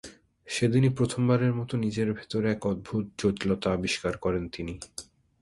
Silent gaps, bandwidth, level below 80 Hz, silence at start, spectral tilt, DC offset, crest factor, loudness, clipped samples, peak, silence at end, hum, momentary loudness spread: none; 11.5 kHz; -52 dBFS; 0.05 s; -6 dB/octave; under 0.1%; 18 dB; -28 LUFS; under 0.1%; -10 dBFS; 0.4 s; none; 13 LU